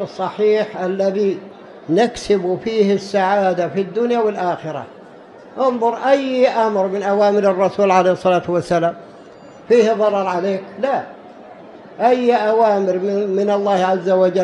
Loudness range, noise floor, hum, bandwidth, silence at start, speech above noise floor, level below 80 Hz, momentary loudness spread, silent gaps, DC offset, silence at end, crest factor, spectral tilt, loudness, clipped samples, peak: 3 LU; -40 dBFS; none; 11 kHz; 0 s; 24 dB; -58 dBFS; 8 LU; none; under 0.1%; 0 s; 16 dB; -6 dB/octave; -17 LUFS; under 0.1%; -2 dBFS